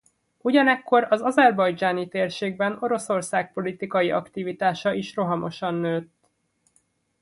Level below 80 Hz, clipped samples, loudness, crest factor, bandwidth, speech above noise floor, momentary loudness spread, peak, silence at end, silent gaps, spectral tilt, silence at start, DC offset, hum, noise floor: -68 dBFS; under 0.1%; -23 LUFS; 18 dB; 11.5 kHz; 47 dB; 9 LU; -6 dBFS; 1.2 s; none; -5.5 dB/octave; 0.45 s; under 0.1%; none; -70 dBFS